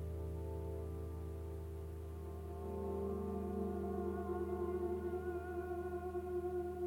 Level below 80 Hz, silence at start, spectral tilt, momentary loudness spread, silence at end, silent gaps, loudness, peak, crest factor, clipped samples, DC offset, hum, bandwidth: -50 dBFS; 0 s; -9 dB/octave; 7 LU; 0 s; none; -43 LUFS; -30 dBFS; 12 dB; under 0.1%; under 0.1%; none; 17 kHz